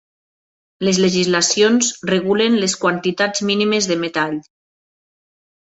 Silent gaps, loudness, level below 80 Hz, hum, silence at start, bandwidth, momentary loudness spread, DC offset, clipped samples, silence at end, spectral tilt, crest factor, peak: none; -17 LUFS; -60 dBFS; none; 0.8 s; 8.2 kHz; 7 LU; under 0.1%; under 0.1%; 1.2 s; -3.5 dB/octave; 16 dB; -2 dBFS